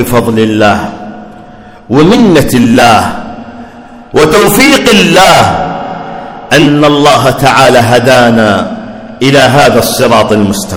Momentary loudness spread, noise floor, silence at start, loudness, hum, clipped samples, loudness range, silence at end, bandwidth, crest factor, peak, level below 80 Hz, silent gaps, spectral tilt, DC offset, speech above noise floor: 17 LU; -30 dBFS; 0 s; -5 LUFS; none; 10%; 2 LU; 0 s; over 20 kHz; 6 dB; 0 dBFS; -32 dBFS; none; -4.5 dB/octave; under 0.1%; 25 dB